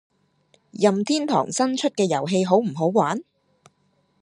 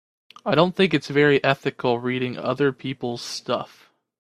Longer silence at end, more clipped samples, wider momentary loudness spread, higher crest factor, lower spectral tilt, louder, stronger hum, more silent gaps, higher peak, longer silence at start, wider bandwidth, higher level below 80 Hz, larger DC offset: first, 1 s vs 0.55 s; neither; second, 4 LU vs 11 LU; about the same, 20 dB vs 22 dB; about the same, -5 dB/octave vs -5.5 dB/octave; about the same, -22 LUFS vs -22 LUFS; neither; neither; second, -4 dBFS vs 0 dBFS; first, 0.75 s vs 0.45 s; second, 11 kHz vs 13.5 kHz; second, -72 dBFS vs -62 dBFS; neither